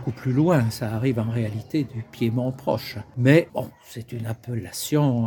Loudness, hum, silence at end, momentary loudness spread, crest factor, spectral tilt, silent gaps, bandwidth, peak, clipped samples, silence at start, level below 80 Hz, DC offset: -24 LUFS; none; 0 s; 14 LU; 20 dB; -7 dB/octave; none; 18 kHz; -4 dBFS; under 0.1%; 0 s; -56 dBFS; under 0.1%